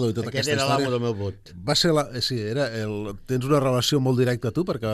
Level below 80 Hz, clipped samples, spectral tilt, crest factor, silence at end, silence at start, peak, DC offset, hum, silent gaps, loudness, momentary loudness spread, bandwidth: -50 dBFS; under 0.1%; -5 dB/octave; 16 dB; 0 s; 0 s; -8 dBFS; under 0.1%; none; none; -24 LUFS; 9 LU; 13.5 kHz